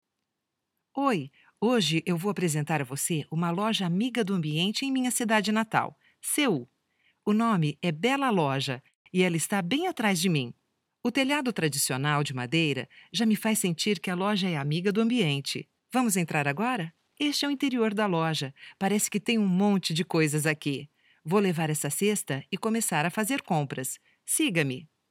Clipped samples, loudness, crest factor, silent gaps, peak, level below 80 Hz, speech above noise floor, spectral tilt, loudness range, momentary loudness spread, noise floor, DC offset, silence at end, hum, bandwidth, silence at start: under 0.1%; -27 LUFS; 20 dB; 8.95-9.05 s; -8 dBFS; -78 dBFS; 57 dB; -4.5 dB/octave; 1 LU; 8 LU; -84 dBFS; under 0.1%; 0.25 s; none; 17 kHz; 0.95 s